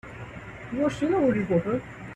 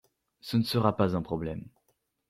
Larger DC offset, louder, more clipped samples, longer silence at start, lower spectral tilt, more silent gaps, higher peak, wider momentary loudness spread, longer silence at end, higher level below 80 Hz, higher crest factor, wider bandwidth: neither; first, -26 LUFS vs -29 LUFS; neither; second, 0.05 s vs 0.45 s; about the same, -7.5 dB/octave vs -7 dB/octave; neither; about the same, -12 dBFS vs -10 dBFS; about the same, 17 LU vs 15 LU; second, 0 s vs 0.6 s; about the same, -52 dBFS vs -56 dBFS; second, 16 dB vs 22 dB; second, 10 kHz vs 15.5 kHz